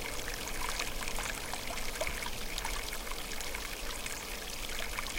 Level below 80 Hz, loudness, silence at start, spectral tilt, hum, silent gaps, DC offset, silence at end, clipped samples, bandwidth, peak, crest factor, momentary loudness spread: -42 dBFS; -37 LUFS; 0 s; -1.5 dB/octave; none; none; under 0.1%; 0 s; under 0.1%; 17 kHz; -18 dBFS; 20 dB; 3 LU